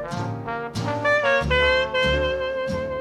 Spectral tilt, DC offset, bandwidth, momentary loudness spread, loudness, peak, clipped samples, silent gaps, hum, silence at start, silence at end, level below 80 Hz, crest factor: -5 dB/octave; under 0.1%; 12 kHz; 10 LU; -22 LUFS; -8 dBFS; under 0.1%; none; none; 0 s; 0 s; -36 dBFS; 14 dB